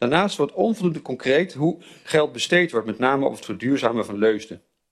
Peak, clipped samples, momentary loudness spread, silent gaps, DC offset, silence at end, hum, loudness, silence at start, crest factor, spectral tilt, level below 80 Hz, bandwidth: -2 dBFS; under 0.1%; 7 LU; none; under 0.1%; 0.35 s; none; -22 LUFS; 0 s; 20 dB; -5 dB/octave; -62 dBFS; 13 kHz